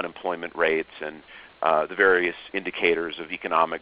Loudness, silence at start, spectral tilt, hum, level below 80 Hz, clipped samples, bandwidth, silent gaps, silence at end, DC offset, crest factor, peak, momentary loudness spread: -24 LUFS; 0 s; -1 dB/octave; none; -60 dBFS; under 0.1%; 5.2 kHz; none; 0.05 s; under 0.1%; 20 dB; -4 dBFS; 14 LU